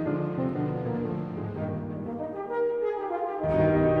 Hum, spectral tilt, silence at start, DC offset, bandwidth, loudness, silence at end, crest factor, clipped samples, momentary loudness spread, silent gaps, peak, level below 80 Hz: none; -10.5 dB/octave; 0 s; under 0.1%; 5 kHz; -29 LUFS; 0 s; 16 dB; under 0.1%; 11 LU; none; -12 dBFS; -50 dBFS